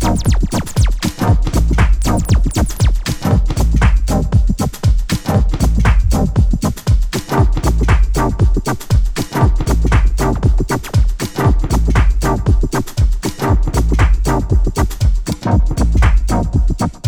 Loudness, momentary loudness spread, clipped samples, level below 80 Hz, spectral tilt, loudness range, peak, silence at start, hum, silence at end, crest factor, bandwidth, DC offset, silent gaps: -16 LUFS; 4 LU; under 0.1%; -14 dBFS; -6 dB/octave; 1 LU; -2 dBFS; 0 s; none; 0 s; 10 dB; 16 kHz; under 0.1%; none